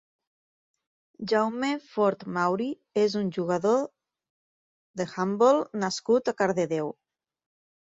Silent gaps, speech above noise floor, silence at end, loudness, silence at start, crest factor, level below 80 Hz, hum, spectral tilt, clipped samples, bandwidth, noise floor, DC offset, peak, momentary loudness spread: 4.30-4.94 s; over 64 dB; 1 s; -26 LUFS; 1.2 s; 20 dB; -72 dBFS; none; -5.5 dB/octave; under 0.1%; 7.8 kHz; under -90 dBFS; under 0.1%; -8 dBFS; 11 LU